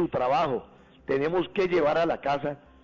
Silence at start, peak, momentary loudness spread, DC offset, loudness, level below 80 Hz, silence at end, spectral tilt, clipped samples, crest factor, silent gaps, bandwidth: 0 s; -16 dBFS; 10 LU; under 0.1%; -27 LUFS; -58 dBFS; 0.3 s; -7 dB/octave; under 0.1%; 10 dB; none; 7.4 kHz